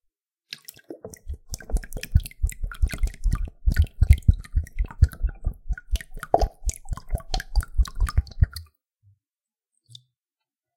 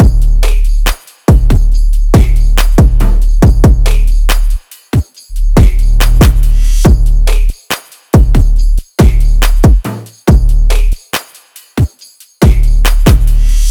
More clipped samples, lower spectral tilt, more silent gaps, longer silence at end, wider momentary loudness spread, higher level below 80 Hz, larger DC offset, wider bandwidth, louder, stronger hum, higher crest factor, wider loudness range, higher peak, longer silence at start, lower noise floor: second, under 0.1% vs 1%; about the same, -5.5 dB/octave vs -6 dB/octave; neither; first, 2.15 s vs 0 s; first, 16 LU vs 8 LU; second, -26 dBFS vs -8 dBFS; neither; about the same, 17 kHz vs 18.5 kHz; second, -27 LUFS vs -11 LUFS; neither; first, 24 dB vs 6 dB; first, 6 LU vs 3 LU; about the same, -2 dBFS vs 0 dBFS; first, 0.5 s vs 0 s; first, under -90 dBFS vs -40 dBFS